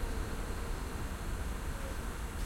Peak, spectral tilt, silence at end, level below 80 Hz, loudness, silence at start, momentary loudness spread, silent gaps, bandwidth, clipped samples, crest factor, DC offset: -24 dBFS; -5 dB/octave; 0 s; -40 dBFS; -41 LUFS; 0 s; 1 LU; none; 16.5 kHz; under 0.1%; 12 dB; under 0.1%